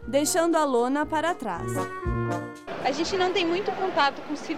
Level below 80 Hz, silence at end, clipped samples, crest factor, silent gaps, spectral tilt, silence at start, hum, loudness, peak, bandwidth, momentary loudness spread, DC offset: -44 dBFS; 0 s; under 0.1%; 18 dB; none; -4 dB/octave; 0 s; none; -26 LUFS; -8 dBFS; 16 kHz; 8 LU; 0.5%